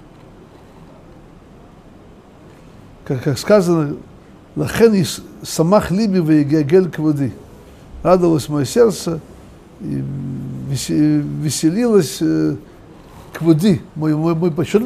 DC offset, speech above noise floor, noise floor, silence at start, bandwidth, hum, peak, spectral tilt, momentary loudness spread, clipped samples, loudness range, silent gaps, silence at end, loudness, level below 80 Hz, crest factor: under 0.1%; 27 dB; -42 dBFS; 0.4 s; 15.5 kHz; none; 0 dBFS; -6.5 dB/octave; 12 LU; under 0.1%; 5 LU; none; 0 s; -17 LUFS; -44 dBFS; 18 dB